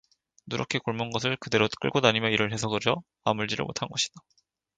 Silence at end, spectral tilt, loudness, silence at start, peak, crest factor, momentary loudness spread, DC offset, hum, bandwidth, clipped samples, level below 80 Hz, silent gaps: 0.6 s; -4 dB/octave; -27 LUFS; 0.45 s; -4 dBFS; 24 dB; 8 LU; under 0.1%; none; 9.4 kHz; under 0.1%; -60 dBFS; none